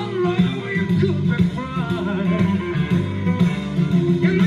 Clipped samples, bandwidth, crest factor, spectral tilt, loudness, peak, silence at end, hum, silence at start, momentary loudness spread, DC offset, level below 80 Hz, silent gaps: under 0.1%; 7.2 kHz; 14 dB; -8 dB/octave; -20 LUFS; -6 dBFS; 0 s; none; 0 s; 4 LU; under 0.1%; -46 dBFS; none